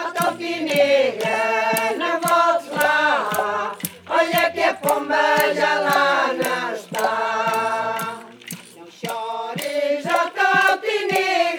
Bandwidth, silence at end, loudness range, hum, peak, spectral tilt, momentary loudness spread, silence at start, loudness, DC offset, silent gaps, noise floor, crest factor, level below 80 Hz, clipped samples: 19.5 kHz; 0 s; 5 LU; none; -2 dBFS; -3 dB/octave; 10 LU; 0 s; -20 LUFS; under 0.1%; none; -41 dBFS; 18 dB; -72 dBFS; under 0.1%